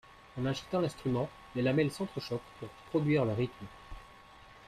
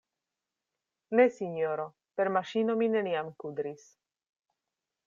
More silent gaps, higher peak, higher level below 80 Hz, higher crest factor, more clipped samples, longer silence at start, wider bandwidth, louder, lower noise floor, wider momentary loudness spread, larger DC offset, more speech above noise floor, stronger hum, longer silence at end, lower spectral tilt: neither; second, -16 dBFS vs -12 dBFS; first, -58 dBFS vs -82 dBFS; about the same, 18 dB vs 20 dB; neither; second, 0.1 s vs 1.1 s; first, 14.5 kHz vs 7.4 kHz; second, -33 LUFS vs -30 LUFS; second, -55 dBFS vs -89 dBFS; first, 20 LU vs 13 LU; neither; second, 22 dB vs 59 dB; neither; second, 0 s vs 1.3 s; about the same, -7 dB/octave vs -6.5 dB/octave